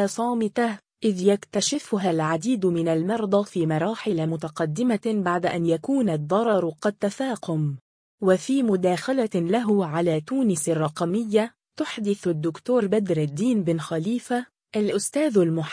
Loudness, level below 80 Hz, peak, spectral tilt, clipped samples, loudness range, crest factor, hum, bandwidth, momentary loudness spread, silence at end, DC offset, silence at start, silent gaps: -24 LUFS; -68 dBFS; -6 dBFS; -6 dB/octave; under 0.1%; 1 LU; 16 dB; none; 10.5 kHz; 6 LU; 0 s; under 0.1%; 0 s; 7.81-8.18 s